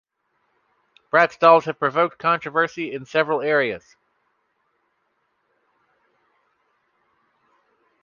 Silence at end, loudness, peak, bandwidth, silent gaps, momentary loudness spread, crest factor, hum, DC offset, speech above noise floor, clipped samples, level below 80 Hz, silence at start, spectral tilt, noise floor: 4.25 s; -20 LUFS; -2 dBFS; 7.2 kHz; none; 9 LU; 22 dB; none; under 0.1%; 51 dB; under 0.1%; -72 dBFS; 1.15 s; -5.5 dB/octave; -71 dBFS